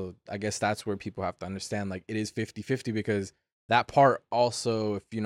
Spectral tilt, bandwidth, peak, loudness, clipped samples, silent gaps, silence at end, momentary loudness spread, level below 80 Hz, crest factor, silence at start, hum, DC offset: -5 dB/octave; 15 kHz; -8 dBFS; -29 LUFS; under 0.1%; 3.52-3.69 s; 0 s; 12 LU; -64 dBFS; 22 dB; 0 s; none; under 0.1%